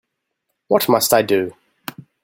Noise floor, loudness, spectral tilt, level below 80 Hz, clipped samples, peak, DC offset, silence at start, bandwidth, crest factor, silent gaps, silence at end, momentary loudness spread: -75 dBFS; -16 LUFS; -3.5 dB/octave; -60 dBFS; under 0.1%; 0 dBFS; under 0.1%; 0.7 s; 17 kHz; 20 dB; none; 0.7 s; 20 LU